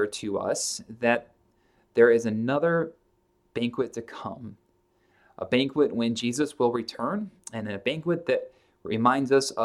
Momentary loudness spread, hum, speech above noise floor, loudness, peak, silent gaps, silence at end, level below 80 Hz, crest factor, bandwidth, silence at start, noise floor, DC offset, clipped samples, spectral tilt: 16 LU; none; 42 dB; -26 LUFS; -6 dBFS; none; 0 s; -68 dBFS; 20 dB; 13.5 kHz; 0 s; -68 dBFS; under 0.1%; under 0.1%; -4.5 dB/octave